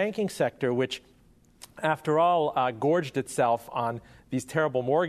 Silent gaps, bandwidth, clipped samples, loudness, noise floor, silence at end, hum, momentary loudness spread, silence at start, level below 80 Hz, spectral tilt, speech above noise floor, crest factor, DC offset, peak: none; 13.5 kHz; under 0.1%; -27 LUFS; -58 dBFS; 0 s; none; 9 LU; 0 s; -64 dBFS; -5.5 dB/octave; 32 dB; 18 dB; under 0.1%; -10 dBFS